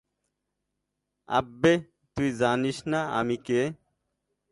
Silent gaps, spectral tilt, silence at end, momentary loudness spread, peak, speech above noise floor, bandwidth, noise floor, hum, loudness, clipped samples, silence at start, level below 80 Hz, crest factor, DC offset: none; -5.5 dB/octave; 0.8 s; 7 LU; -6 dBFS; 56 dB; 11.5 kHz; -82 dBFS; none; -27 LUFS; under 0.1%; 1.3 s; -58 dBFS; 22 dB; under 0.1%